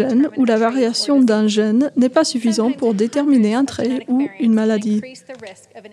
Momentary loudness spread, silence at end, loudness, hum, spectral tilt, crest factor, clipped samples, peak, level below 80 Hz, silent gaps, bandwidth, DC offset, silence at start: 8 LU; 0.05 s; -17 LUFS; none; -5 dB/octave; 14 dB; under 0.1%; -2 dBFS; -66 dBFS; none; 11.5 kHz; under 0.1%; 0 s